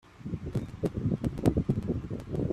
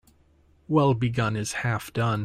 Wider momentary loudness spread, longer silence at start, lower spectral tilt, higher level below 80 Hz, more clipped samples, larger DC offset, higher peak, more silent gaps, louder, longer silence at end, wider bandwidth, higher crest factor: about the same, 8 LU vs 6 LU; second, 0.05 s vs 0.7 s; first, -9 dB/octave vs -6 dB/octave; first, -44 dBFS vs -54 dBFS; neither; neither; about the same, -10 dBFS vs -8 dBFS; neither; second, -32 LUFS vs -25 LUFS; about the same, 0 s vs 0 s; about the same, 14 kHz vs 15 kHz; about the same, 22 dB vs 18 dB